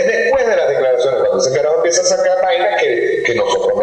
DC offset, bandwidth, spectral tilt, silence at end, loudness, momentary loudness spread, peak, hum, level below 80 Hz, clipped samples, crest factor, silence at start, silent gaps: under 0.1%; 9.2 kHz; -2.5 dB/octave; 0 s; -14 LUFS; 2 LU; -2 dBFS; none; -52 dBFS; under 0.1%; 12 dB; 0 s; none